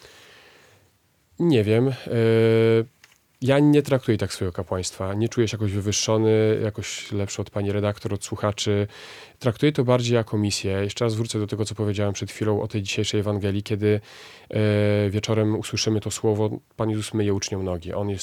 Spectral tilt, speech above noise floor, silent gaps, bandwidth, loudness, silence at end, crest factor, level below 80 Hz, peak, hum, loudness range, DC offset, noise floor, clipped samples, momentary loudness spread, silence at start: -5.5 dB/octave; 40 dB; none; 14.5 kHz; -23 LUFS; 0 s; 18 dB; -60 dBFS; -4 dBFS; none; 4 LU; under 0.1%; -63 dBFS; under 0.1%; 9 LU; 1.4 s